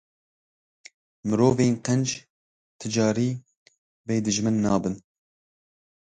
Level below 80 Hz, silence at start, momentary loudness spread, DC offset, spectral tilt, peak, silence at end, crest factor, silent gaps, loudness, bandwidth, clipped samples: -58 dBFS; 1.25 s; 16 LU; under 0.1%; -5.5 dB/octave; -8 dBFS; 1.15 s; 18 dB; 2.30-2.79 s, 3.57-3.66 s, 3.78-4.04 s; -24 LUFS; 9.4 kHz; under 0.1%